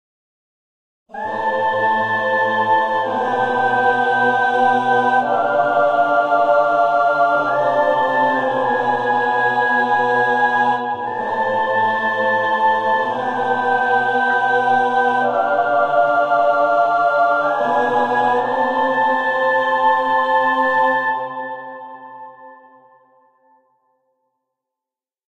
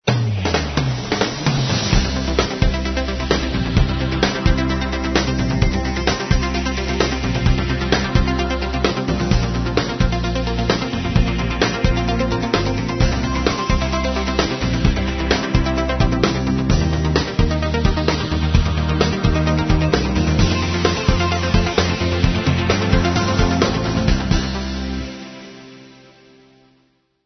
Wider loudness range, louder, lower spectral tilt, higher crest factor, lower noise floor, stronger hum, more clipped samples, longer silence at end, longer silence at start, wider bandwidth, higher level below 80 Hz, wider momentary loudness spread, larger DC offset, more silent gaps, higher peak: about the same, 3 LU vs 2 LU; first, -16 LUFS vs -19 LUFS; about the same, -5.5 dB/octave vs -5.5 dB/octave; about the same, 14 dB vs 18 dB; first, -89 dBFS vs -61 dBFS; neither; neither; first, 2.75 s vs 1.35 s; first, 1.15 s vs 0.05 s; first, 9 kHz vs 6.4 kHz; second, -62 dBFS vs -24 dBFS; about the same, 5 LU vs 4 LU; neither; neither; second, -4 dBFS vs 0 dBFS